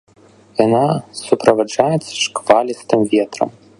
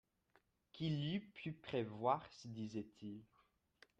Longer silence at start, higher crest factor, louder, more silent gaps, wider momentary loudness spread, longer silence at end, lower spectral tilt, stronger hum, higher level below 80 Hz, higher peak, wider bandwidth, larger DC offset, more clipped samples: second, 0.55 s vs 0.75 s; second, 16 dB vs 22 dB; first, -16 LUFS vs -44 LUFS; neither; second, 7 LU vs 14 LU; second, 0.3 s vs 0.75 s; second, -5 dB/octave vs -7 dB/octave; neither; first, -56 dBFS vs -78 dBFS; first, 0 dBFS vs -24 dBFS; first, 11.5 kHz vs 8.2 kHz; neither; neither